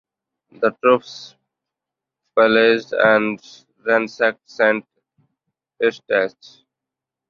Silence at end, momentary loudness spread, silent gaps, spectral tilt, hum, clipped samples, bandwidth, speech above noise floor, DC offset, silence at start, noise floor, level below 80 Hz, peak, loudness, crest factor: 1 s; 11 LU; none; -5 dB/octave; none; under 0.1%; 7.2 kHz; 68 dB; under 0.1%; 0.6 s; -86 dBFS; -66 dBFS; 0 dBFS; -18 LUFS; 20 dB